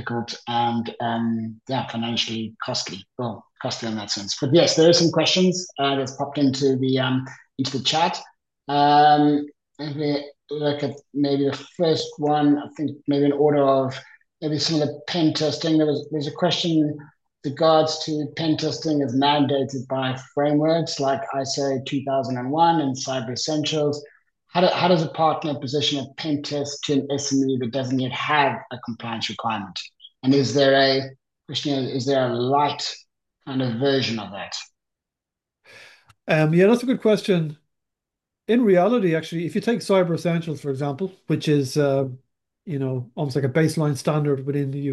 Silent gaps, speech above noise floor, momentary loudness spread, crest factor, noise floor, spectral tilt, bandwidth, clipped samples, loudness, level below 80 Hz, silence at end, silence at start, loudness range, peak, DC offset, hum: none; 65 dB; 12 LU; 18 dB; -86 dBFS; -5 dB/octave; 12 kHz; under 0.1%; -22 LUFS; -70 dBFS; 0 s; 0 s; 4 LU; -4 dBFS; under 0.1%; none